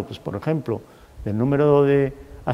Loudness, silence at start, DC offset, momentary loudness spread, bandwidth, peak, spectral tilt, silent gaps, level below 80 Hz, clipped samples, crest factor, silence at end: -21 LUFS; 0 s; under 0.1%; 14 LU; 6.8 kHz; -4 dBFS; -9 dB/octave; none; -46 dBFS; under 0.1%; 18 dB; 0 s